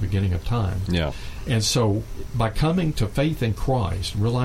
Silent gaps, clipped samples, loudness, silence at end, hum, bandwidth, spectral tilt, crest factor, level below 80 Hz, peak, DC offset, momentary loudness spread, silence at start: none; under 0.1%; -24 LUFS; 0 s; none; 16 kHz; -5.5 dB/octave; 14 dB; -32 dBFS; -8 dBFS; under 0.1%; 5 LU; 0 s